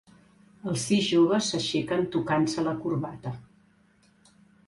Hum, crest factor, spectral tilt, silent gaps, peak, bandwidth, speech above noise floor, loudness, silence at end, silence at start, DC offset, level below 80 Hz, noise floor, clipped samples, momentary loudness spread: none; 16 dB; -5 dB/octave; none; -12 dBFS; 11.5 kHz; 36 dB; -26 LUFS; 1.25 s; 0.65 s; under 0.1%; -62 dBFS; -62 dBFS; under 0.1%; 16 LU